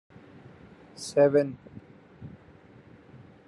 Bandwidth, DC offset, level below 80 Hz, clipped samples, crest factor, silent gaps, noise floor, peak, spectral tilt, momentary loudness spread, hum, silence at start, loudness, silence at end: 11.5 kHz; under 0.1%; -68 dBFS; under 0.1%; 20 dB; none; -53 dBFS; -10 dBFS; -6 dB/octave; 27 LU; none; 1 s; -25 LUFS; 1.2 s